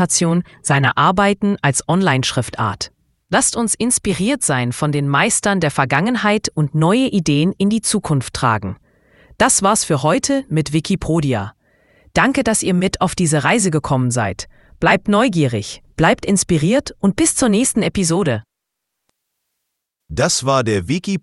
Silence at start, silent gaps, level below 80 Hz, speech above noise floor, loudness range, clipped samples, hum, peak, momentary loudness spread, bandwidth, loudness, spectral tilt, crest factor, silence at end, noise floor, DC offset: 0 s; none; -42 dBFS; 62 dB; 2 LU; under 0.1%; none; 0 dBFS; 7 LU; 12 kHz; -16 LUFS; -4.5 dB/octave; 16 dB; 0.05 s; -78 dBFS; under 0.1%